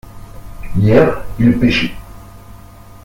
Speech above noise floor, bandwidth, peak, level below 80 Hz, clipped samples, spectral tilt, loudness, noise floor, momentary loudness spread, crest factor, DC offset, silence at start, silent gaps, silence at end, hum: 25 dB; 16.5 kHz; 0 dBFS; -32 dBFS; under 0.1%; -7.5 dB/octave; -14 LUFS; -37 dBFS; 17 LU; 16 dB; under 0.1%; 0.05 s; none; 0.1 s; 50 Hz at -40 dBFS